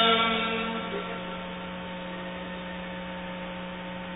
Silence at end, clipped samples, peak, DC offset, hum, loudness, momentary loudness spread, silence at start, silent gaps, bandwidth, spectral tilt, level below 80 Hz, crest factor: 0 s; under 0.1%; -10 dBFS; under 0.1%; none; -31 LUFS; 12 LU; 0 s; none; 4 kHz; -8.5 dB/octave; -54 dBFS; 20 dB